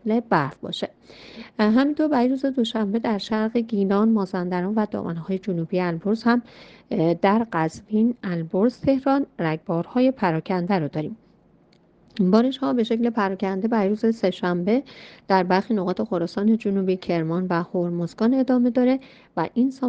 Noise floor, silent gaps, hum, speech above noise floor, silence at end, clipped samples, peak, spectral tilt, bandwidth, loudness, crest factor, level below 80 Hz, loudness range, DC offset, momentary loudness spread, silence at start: -57 dBFS; none; none; 35 dB; 0 s; under 0.1%; -4 dBFS; -8 dB/octave; 8 kHz; -23 LUFS; 18 dB; -60 dBFS; 2 LU; under 0.1%; 9 LU; 0.05 s